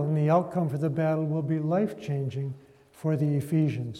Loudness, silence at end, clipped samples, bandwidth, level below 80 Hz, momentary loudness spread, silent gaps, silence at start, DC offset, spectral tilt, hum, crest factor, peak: -28 LUFS; 0 s; under 0.1%; 13 kHz; -68 dBFS; 9 LU; none; 0 s; under 0.1%; -9 dB/octave; none; 16 dB; -10 dBFS